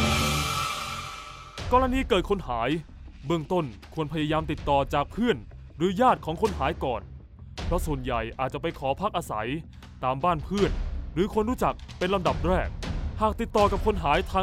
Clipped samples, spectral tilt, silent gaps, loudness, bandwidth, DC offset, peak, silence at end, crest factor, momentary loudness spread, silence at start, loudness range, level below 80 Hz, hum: under 0.1%; -5.5 dB/octave; none; -27 LUFS; 16 kHz; under 0.1%; -8 dBFS; 0 s; 18 dB; 12 LU; 0 s; 3 LU; -36 dBFS; none